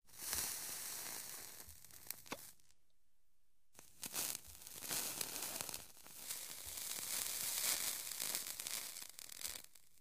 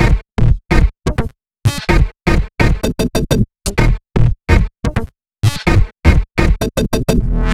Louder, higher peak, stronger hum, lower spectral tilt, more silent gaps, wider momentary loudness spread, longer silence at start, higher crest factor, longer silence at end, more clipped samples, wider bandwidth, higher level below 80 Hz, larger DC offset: second, -43 LUFS vs -16 LUFS; second, -16 dBFS vs 0 dBFS; neither; second, 0.5 dB/octave vs -6 dB/octave; neither; first, 14 LU vs 6 LU; about the same, 0 s vs 0 s; first, 32 dB vs 14 dB; first, 0.35 s vs 0 s; second, under 0.1% vs 0.3%; about the same, 16 kHz vs 15 kHz; second, -74 dBFS vs -16 dBFS; neither